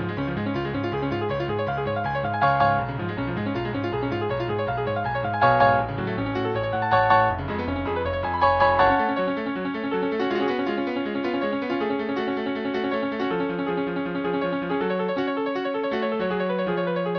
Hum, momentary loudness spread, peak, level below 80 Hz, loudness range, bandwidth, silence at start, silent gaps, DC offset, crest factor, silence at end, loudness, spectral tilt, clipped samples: none; 8 LU; -6 dBFS; -48 dBFS; 4 LU; 5.4 kHz; 0 s; none; under 0.1%; 18 dB; 0 s; -24 LUFS; -8.5 dB/octave; under 0.1%